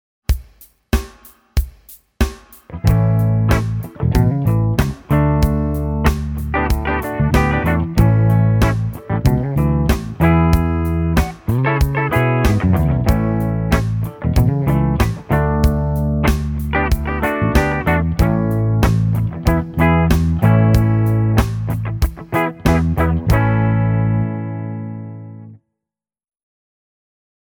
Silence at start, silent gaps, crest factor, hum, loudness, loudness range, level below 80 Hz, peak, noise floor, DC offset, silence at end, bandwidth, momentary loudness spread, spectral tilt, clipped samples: 0.3 s; none; 16 dB; none; -17 LUFS; 4 LU; -24 dBFS; 0 dBFS; -86 dBFS; under 0.1%; 1.95 s; 19 kHz; 8 LU; -7.5 dB/octave; under 0.1%